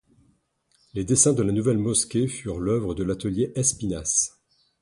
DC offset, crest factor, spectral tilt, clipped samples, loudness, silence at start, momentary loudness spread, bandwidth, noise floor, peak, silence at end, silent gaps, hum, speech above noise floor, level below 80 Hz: under 0.1%; 20 dB; -4.5 dB/octave; under 0.1%; -23 LUFS; 0.95 s; 10 LU; 11.5 kHz; -68 dBFS; -4 dBFS; 0.55 s; none; none; 44 dB; -48 dBFS